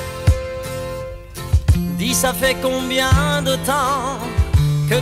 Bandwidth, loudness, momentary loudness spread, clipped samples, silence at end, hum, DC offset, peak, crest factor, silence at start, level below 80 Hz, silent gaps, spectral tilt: 16 kHz; -18 LUFS; 11 LU; under 0.1%; 0 s; none; under 0.1%; -4 dBFS; 14 dB; 0 s; -26 dBFS; none; -4.5 dB/octave